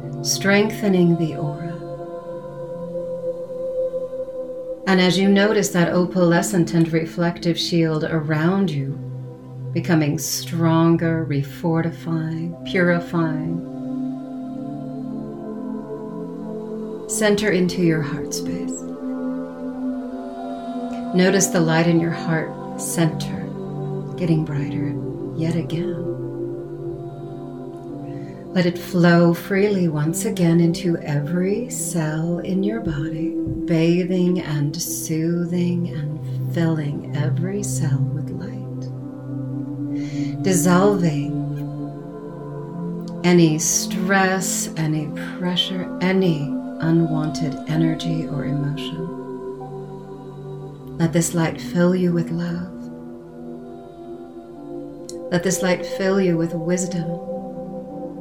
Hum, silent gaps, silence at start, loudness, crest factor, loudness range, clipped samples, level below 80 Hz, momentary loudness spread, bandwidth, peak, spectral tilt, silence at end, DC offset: none; none; 0 s; -21 LUFS; 18 dB; 8 LU; under 0.1%; -52 dBFS; 15 LU; 17.5 kHz; -4 dBFS; -5.5 dB/octave; 0 s; 0.2%